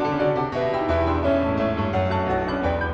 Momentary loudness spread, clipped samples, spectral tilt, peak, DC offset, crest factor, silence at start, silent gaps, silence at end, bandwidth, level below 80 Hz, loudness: 2 LU; under 0.1%; -8 dB/octave; -8 dBFS; under 0.1%; 14 dB; 0 s; none; 0 s; 7.6 kHz; -36 dBFS; -23 LUFS